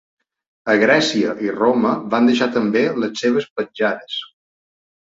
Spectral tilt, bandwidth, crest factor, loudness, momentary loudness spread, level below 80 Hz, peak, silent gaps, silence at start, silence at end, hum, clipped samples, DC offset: -4.5 dB/octave; 7.8 kHz; 18 dB; -18 LUFS; 12 LU; -62 dBFS; -2 dBFS; 3.50-3.56 s; 0.65 s; 0.75 s; none; under 0.1%; under 0.1%